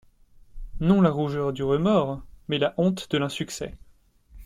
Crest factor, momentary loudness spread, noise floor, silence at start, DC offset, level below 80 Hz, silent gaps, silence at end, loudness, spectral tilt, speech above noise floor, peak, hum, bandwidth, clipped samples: 18 dB; 12 LU; -57 dBFS; 0.55 s; under 0.1%; -44 dBFS; none; 0 s; -25 LUFS; -6.5 dB/octave; 34 dB; -6 dBFS; none; 13.5 kHz; under 0.1%